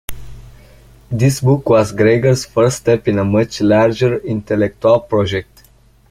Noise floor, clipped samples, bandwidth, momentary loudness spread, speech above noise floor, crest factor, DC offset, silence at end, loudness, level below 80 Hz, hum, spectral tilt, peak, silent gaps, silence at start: -49 dBFS; under 0.1%; 16.5 kHz; 7 LU; 35 dB; 14 dB; under 0.1%; 0.7 s; -15 LUFS; -42 dBFS; none; -6.5 dB/octave; 0 dBFS; none; 0.1 s